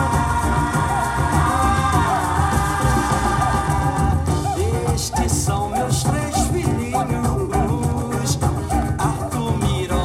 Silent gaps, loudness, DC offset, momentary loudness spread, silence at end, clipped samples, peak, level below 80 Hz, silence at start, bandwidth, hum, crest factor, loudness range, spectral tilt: none; -20 LUFS; under 0.1%; 4 LU; 0 s; under 0.1%; -6 dBFS; -28 dBFS; 0 s; 16 kHz; none; 14 dB; 2 LU; -5.5 dB/octave